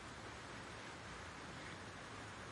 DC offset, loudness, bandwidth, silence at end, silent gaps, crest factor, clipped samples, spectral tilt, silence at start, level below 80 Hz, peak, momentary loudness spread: under 0.1%; -51 LUFS; 11.5 kHz; 0 s; none; 14 dB; under 0.1%; -3.5 dB/octave; 0 s; -66 dBFS; -38 dBFS; 1 LU